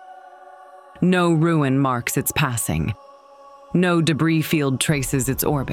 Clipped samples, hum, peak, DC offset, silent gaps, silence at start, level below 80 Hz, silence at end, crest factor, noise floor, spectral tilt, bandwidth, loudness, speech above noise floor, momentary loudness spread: under 0.1%; none; -6 dBFS; under 0.1%; none; 0 s; -44 dBFS; 0 s; 16 dB; -46 dBFS; -5 dB/octave; 17.5 kHz; -20 LUFS; 26 dB; 6 LU